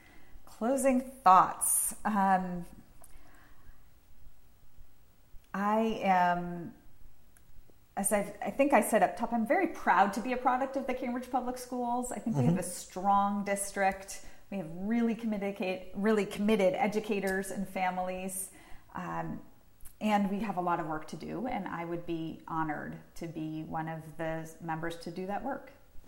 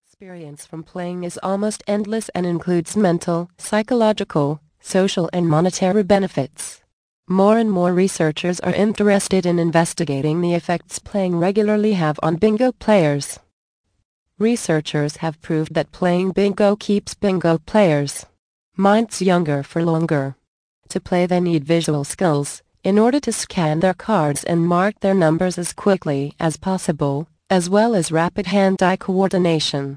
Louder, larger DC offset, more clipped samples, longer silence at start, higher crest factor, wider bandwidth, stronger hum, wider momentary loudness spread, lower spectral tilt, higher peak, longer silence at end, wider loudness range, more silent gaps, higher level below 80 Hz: second, -31 LUFS vs -19 LUFS; neither; neither; about the same, 0.15 s vs 0.2 s; first, 22 dB vs 16 dB; first, 16 kHz vs 10.5 kHz; neither; first, 14 LU vs 9 LU; about the same, -5 dB/octave vs -6 dB/octave; second, -10 dBFS vs -2 dBFS; about the same, 0 s vs 0 s; first, 9 LU vs 2 LU; second, none vs 6.93-7.23 s, 13.53-13.84 s, 14.05-14.26 s, 18.39-18.72 s, 20.48-20.82 s; second, -58 dBFS vs -52 dBFS